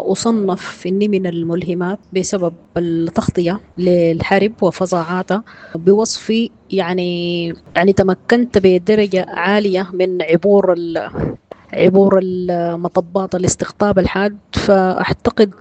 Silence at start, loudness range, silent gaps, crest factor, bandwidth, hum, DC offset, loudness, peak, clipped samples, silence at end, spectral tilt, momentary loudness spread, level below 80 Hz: 0 s; 3 LU; none; 16 dB; 9 kHz; none; under 0.1%; -16 LUFS; 0 dBFS; under 0.1%; 0.1 s; -5.5 dB/octave; 8 LU; -44 dBFS